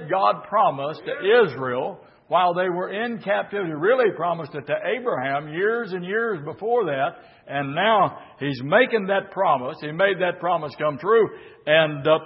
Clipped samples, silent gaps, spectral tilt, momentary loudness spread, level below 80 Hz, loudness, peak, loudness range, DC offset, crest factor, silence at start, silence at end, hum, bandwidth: under 0.1%; none; -10 dB/octave; 10 LU; -70 dBFS; -22 LUFS; -4 dBFS; 3 LU; under 0.1%; 20 dB; 0 s; 0 s; none; 5.8 kHz